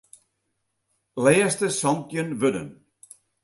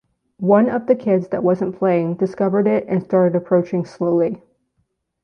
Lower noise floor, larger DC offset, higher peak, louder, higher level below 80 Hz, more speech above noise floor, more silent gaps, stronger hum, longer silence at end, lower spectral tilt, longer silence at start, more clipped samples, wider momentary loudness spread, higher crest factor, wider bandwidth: first, -76 dBFS vs -69 dBFS; neither; about the same, -4 dBFS vs -2 dBFS; second, -23 LUFS vs -18 LUFS; about the same, -64 dBFS vs -62 dBFS; about the same, 54 dB vs 52 dB; neither; neither; second, 0.7 s vs 0.85 s; second, -4.5 dB/octave vs -10 dB/octave; first, 1.15 s vs 0.4 s; neither; first, 16 LU vs 6 LU; first, 22 dB vs 16 dB; first, 12 kHz vs 6.8 kHz